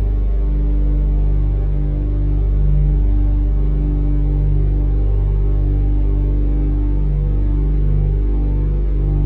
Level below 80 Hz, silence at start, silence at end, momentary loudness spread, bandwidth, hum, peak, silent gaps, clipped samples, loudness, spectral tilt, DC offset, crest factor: -16 dBFS; 0 s; 0 s; 2 LU; 2.4 kHz; 50 Hz at -30 dBFS; -6 dBFS; none; under 0.1%; -19 LUFS; -12 dB/octave; under 0.1%; 10 dB